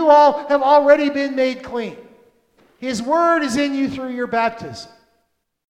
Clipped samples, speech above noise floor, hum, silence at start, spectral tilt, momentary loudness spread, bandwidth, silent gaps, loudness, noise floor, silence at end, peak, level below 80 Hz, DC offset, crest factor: under 0.1%; 50 dB; none; 0 s; -4.5 dB/octave; 18 LU; 11.5 kHz; none; -17 LUFS; -68 dBFS; 0.85 s; 0 dBFS; -58 dBFS; under 0.1%; 18 dB